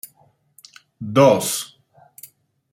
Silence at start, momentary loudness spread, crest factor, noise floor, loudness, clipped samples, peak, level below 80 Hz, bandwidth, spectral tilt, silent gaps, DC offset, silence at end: 1 s; 22 LU; 20 dB; -59 dBFS; -17 LUFS; under 0.1%; -2 dBFS; -66 dBFS; 16.5 kHz; -4.5 dB/octave; none; under 0.1%; 1.05 s